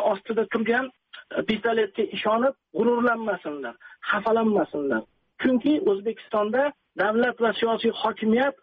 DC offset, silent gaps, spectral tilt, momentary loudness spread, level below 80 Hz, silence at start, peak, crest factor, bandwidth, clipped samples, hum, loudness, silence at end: under 0.1%; none; -3 dB/octave; 8 LU; -66 dBFS; 0 s; -12 dBFS; 14 dB; 5.2 kHz; under 0.1%; none; -24 LUFS; 0.1 s